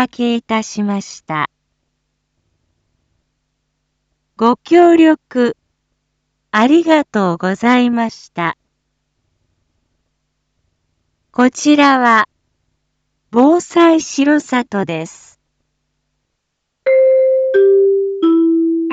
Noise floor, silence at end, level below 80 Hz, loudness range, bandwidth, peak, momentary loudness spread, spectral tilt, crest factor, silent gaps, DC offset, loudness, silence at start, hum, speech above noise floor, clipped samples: -73 dBFS; 0 s; -62 dBFS; 11 LU; 8 kHz; 0 dBFS; 12 LU; -5 dB/octave; 14 dB; none; under 0.1%; -13 LUFS; 0 s; none; 60 dB; under 0.1%